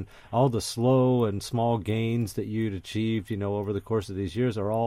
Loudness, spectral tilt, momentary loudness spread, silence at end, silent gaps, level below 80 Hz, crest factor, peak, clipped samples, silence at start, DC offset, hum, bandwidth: -27 LUFS; -7 dB/octave; 8 LU; 0 s; none; -54 dBFS; 16 dB; -12 dBFS; under 0.1%; 0 s; under 0.1%; none; 15.5 kHz